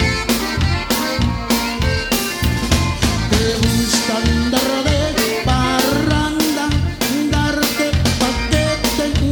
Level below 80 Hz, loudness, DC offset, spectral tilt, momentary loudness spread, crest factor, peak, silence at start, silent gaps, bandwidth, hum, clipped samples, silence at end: -26 dBFS; -17 LUFS; under 0.1%; -4.5 dB/octave; 3 LU; 16 dB; 0 dBFS; 0 s; none; over 20 kHz; none; under 0.1%; 0 s